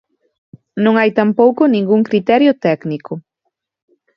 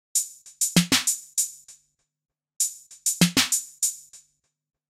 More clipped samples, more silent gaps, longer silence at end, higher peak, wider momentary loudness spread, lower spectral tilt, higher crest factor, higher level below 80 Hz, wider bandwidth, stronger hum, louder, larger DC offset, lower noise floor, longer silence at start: neither; neither; first, 0.95 s vs 0.7 s; first, 0 dBFS vs -4 dBFS; first, 15 LU vs 8 LU; first, -8.5 dB/octave vs -2 dB/octave; second, 14 dB vs 22 dB; about the same, -62 dBFS vs -60 dBFS; second, 6 kHz vs 16 kHz; neither; first, -14 LUFS vs -23 LUFS; neither; first, -73 dBFS vs -69 dBFS; first, 0.75 s vs 0.15 s